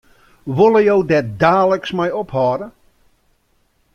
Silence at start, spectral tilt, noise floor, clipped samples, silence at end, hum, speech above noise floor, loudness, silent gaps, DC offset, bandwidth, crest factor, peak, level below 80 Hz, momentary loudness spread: 0.45 s; -7.5 dB/octave; -61 dBFS; under 0.1%; 1.25 s; none; 46 dB; -16 LUFS; none; under 0.1%; 7 kHz; 16 dB; -2 dBFS; -52 dBFS; 13 LU